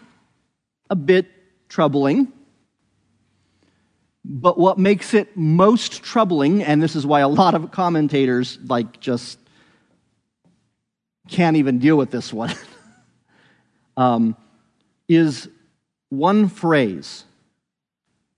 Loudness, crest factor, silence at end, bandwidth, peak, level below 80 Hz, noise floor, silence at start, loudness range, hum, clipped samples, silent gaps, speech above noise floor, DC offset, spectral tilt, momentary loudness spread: -18 LUFS; 20 dB; 1.15 s; 10.5 kHz; 0 dBFS; -68 dBFS; -81 dBFS; 0.9 s; 6 LU; none; under 0.1%; none; 63 dB; under 0.1%; -6.5 dB/octave; 15 LU